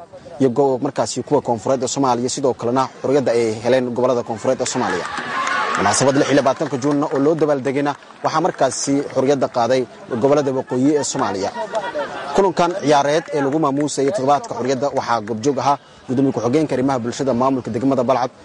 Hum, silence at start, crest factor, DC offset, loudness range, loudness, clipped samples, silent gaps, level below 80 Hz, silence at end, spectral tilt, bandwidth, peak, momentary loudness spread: none; 0 s; 14 dB; under 0.1%; 1 LU; -19 LUFS; under 0.1%; none; -56 dBFS; 0 s; -5 dB/octave; 11.5 kHz; -4 dBFS; 6 LU